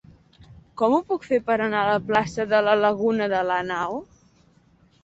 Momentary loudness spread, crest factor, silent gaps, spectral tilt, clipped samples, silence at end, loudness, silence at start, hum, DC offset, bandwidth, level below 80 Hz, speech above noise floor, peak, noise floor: 7 LU; 18 dB; none; -5.5 dB/octave; under 0.1%; 1 s; -22 LUFS; 0.4 s; none; under 0.1%; 8 kHz; -58 dBFS; 36 dB; -4 dBFS; -58 dBFS